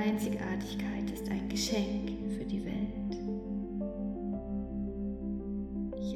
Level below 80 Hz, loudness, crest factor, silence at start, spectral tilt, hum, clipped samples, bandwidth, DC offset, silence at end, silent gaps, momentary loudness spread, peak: -48 dBFS; -36 LUFS; 16 dB; 0 s; -5.5 dB/octave; none; under 0.1%; 14.5 kHz; under 0.1%; 0 s; none; 6 LU; -18 dBFS